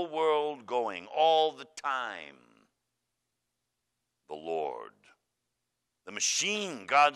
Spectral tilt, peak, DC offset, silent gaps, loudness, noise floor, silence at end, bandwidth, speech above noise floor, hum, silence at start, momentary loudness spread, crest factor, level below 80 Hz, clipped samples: -1 dB/octave; -10 dBFS; under 0.1%; none; -30 LUFS; -84 dBFS; 0 s; 13 kHz; 54 dB; none; 0 s; 19 LU; 22 dB; -84 dBFS; under 0.1%